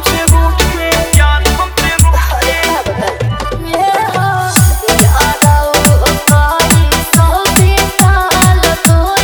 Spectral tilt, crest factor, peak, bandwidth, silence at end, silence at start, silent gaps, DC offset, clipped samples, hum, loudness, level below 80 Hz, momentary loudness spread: -4 dB/octave; 10 dB; 0 dBFS; over 20 kHz; 0 s; 0 s; none; under 0.1%; 0.6%; none; -10 LUFS; -14 dBFS; 5 LU